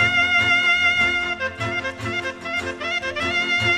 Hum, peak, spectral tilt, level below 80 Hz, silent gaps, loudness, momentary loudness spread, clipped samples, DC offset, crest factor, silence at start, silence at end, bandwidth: none; -6 dBFS; -3 dB/octave; -50 dBFS; none; -20 LUFS; 10 LU; under 0.1%; under 0.1%; 16 dB; 0 s; 0 s; 13 kHz